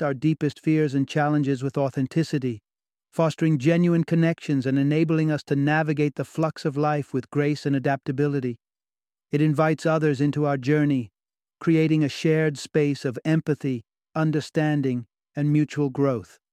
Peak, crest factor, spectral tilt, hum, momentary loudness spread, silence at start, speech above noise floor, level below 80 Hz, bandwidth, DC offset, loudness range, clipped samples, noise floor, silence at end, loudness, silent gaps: -8 dBFS; 16 dB; -7.5 dB/octave; none; 7 LU; 0 s; over 67 dB; -66 dBFS; 10.5 kHz; under 0.1%; 3 LU; under 0.1%; under -90 dBFS; 0.3 s; -24 LUFS; none